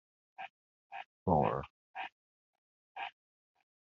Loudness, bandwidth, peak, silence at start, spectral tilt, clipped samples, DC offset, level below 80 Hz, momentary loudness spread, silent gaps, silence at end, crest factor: -37 LUFS; 6.6 kHz; -14 dBFS; 0.4 s; -6 dB/octave; under 0.1%; under 0.1%; -64 dBFS; 19 LU; 0.50-0.90 s, 1.05-1.26 s, 1.70-1.94 s, 2.12-2.95 s; 0.85 s; 26 dB